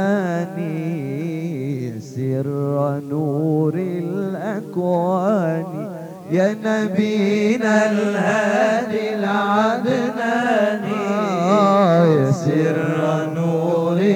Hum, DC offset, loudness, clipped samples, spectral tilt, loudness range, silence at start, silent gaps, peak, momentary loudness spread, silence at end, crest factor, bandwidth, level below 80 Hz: none; under 0.1%; -19 LUFS; under 0.1%; -7 dB/octave; 5 LU; 0 s; none; -4 dBFS; 9 LU; 0 s; 16 dB; 17.5 kHz; -72 dBFS